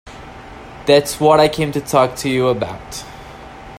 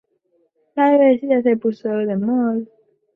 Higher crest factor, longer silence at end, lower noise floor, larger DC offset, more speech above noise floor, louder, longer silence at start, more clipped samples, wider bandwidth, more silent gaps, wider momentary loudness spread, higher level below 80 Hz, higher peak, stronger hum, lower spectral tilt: about the same, 18 dB vs 14 dB; second, 0 s vs 0.5 s; second, -35 dBFS vs -64 dBFS; neither; second, 20 dB vs 47 dB; about the same, -16 LUFS vs -18 LUFS; second, 0.05 s vs 0.75 s; neither; first, 16 kHz vs 5.2 kHz; neither; first, 23 LU vs 12 LU; first, -42 dBFS vs -68 dBFS; first, 0 dBFS vs -4 dBFS; neither; second, -5 dB/octave vs -9.5 dB/octave